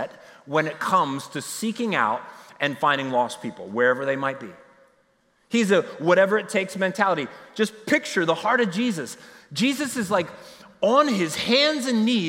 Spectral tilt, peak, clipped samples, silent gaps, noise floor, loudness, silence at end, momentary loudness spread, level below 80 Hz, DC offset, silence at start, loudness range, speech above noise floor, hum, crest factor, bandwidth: -4 dB/octave; -4 dBFS; under 0.1%; none; -64 dBFS; -23 LUFS; 0 s; 13 LU; -72 dBFS; under 0.1%; 0 s; 3 LU; 41 dB; none; 20 dB; 16.5 kHz